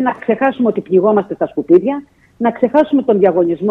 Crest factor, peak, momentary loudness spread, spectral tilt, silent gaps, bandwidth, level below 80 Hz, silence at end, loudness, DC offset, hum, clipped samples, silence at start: 14 dB; 0 dBFS; 8 LU; -9.5 dB/octave; none; 4.1 kHz; -56 dBFS; 0 s; -14 LUFS; under 0.1%; none; under 0.1%; 0 s